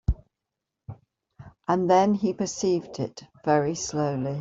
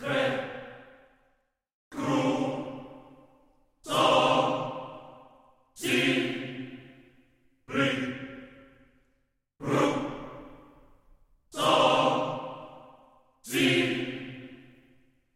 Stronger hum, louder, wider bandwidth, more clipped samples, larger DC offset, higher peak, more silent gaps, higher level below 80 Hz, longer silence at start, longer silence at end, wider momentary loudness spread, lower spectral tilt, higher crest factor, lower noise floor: neither; about the same, -26 LUFS vs -27 LUFS; second, 7.8 kHz vs 16 kHz; neither; neither; about the same, -8 dBFS vs -8 dBFS; second, none vs 1.74-1.91 s; first, -40 dBFS vs -64 dBFS; about the same, 0.1 s vs 0 s; second, 0 s vs 0.75 s; second, 16 LU vs 23 LU; about the same, -5.5 dB/octave vs -4.5 dB/octave; about the same, 18 dB vs 22 dB; first, -85 dBFS vs -74 dBFS